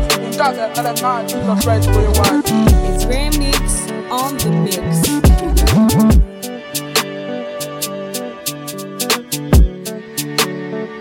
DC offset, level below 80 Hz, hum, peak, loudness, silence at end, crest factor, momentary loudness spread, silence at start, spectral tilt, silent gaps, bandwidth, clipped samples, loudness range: under 0.1%; -20 dBFS; none; 0 dBFS; -16 LUFS; 0 s; 14 dB; 11 LU; 0 s; -5 dB/octave; none; 17 kHz; under 0.1%; 5 LU